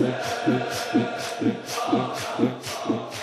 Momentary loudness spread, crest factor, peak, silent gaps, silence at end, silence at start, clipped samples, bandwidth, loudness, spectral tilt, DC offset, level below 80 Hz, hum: 4 LU; 18 dB; -8 dBFS; none; 0 s; 0 s; under 0.1%; 14.5 kHz; -26 LUFS; -5 dB/octave; under 0.1%; -66 dBFS; none